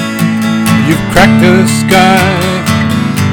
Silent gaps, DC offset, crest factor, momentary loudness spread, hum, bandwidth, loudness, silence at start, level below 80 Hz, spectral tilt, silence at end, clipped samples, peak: none; under 0.1%; 8 dB; 6 LU; none; 19 kHz; -8 LUFS; 0 s; -32 dBFS; -5 dB/octave; 0 s; 1%; 0 dBFS